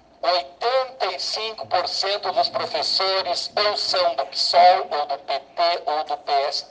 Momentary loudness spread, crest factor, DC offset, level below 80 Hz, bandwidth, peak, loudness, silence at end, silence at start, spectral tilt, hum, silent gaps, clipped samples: 9 LU; 18 dB; under 0.1%; -68 dBFS; 9.6 kHz; -4 dBFS; -21 LUFS; 0.05 s; 0.25 s; -1 dB/octave; none; none; under 0.1%